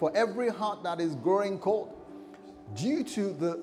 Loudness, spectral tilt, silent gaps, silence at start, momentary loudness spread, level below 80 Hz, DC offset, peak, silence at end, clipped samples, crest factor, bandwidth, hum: -30 LUFS; -6 dB/octave; none; 0 s; 20 LU; -70 dBFS; under 0.1%; -14 dBFS; 0 s; under 0.1%; 16 dB; 14.5 kHz; none